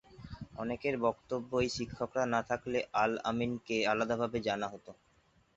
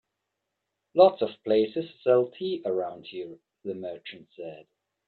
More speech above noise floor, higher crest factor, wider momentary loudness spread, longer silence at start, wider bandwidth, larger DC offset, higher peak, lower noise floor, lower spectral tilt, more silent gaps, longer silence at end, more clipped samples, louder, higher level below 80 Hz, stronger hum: second, 35 dB vs 56 dB; about the same, 20 dB vs 22 dB; second, 10 LU vs 21 LU; second, 0.1 s vs 0.95 s; first, 8 kHz vs 4.6 kHz; neither; second, -16 dBFS vs -6 dBFS; second, -69 dBFS vs -83 dBFS; second, -4 dB/octave vs -8.5 dB/octave; neither; first, 0.65 s vs 0.45 s; neither; second, -34 LUFS vs -26 LUFS; first, -62 dBFS vs -74 dBFS; neither